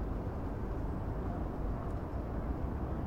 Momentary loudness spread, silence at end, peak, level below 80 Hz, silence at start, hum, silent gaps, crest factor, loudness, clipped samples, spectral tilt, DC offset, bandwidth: 1 LU; 0 s; -26 dBFS; -40 dBFS; 0 s; none; none; 12 dB; -39 LUFS; under 0.1%; -9.5 dB/octave; under 0.1%; 6.8 kHz